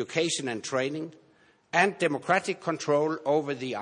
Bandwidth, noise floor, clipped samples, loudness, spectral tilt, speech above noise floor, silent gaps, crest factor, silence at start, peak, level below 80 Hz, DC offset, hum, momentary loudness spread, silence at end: 10.5 kHz; -62 dBFS; under 0.1%; -28 LUFS; -4 dB/octave; 34 dB; none; 20 dB; 0 s; -8 dBFS; -78 dBFS; under 0.1%; none; 7 LU; 0 s